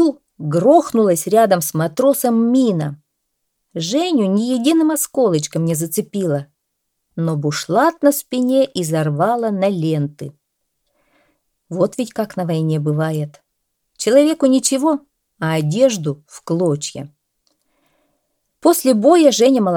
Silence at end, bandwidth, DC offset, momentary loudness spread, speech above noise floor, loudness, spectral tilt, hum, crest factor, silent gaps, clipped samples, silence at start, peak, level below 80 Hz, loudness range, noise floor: 0 s; 18.5 kHz; under 0.1%; 12 LU; 58 dB; -17 LUFS; -5.5 dB/octave; none; 16 dB; none; under 0.1%; 0 s; 0 dBFS; -66 dBFS; 6 LU; -74 dBFS